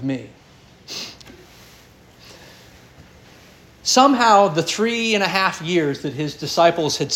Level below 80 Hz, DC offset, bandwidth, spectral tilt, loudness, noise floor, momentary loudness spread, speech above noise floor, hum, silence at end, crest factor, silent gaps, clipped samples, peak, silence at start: -58 dBFS; under 0.1%; 17 kHz; -3.5 dB/octave; -18 LUFS; -48 dBFS; 17 LU; 30 dB; none; 0 s; 20 dB; none; under 0.1%; -2 dBFS; 0 s